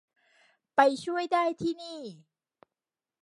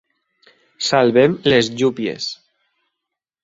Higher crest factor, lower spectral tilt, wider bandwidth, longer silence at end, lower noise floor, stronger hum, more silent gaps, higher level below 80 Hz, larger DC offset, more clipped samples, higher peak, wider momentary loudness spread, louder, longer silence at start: first, 24 dB vs 18 dB; about the same, -4.5 dB/octave vs -4.5 dB/octave; first, 11.5 kHz vs 8 kHz; about the same, 1.05 s vs 1.1 s; first, under -90 dBFS vs -82 dBFS; neither; neither; second, -74 dBFS vs -56 dBFS; neither; neither; second, -6 dBFS vs -2 dBFS; first, 17 LU vs 13 LU; second, -28 LUFS vs -17 LUFS; about the same, 0.75 s vs 0.8 s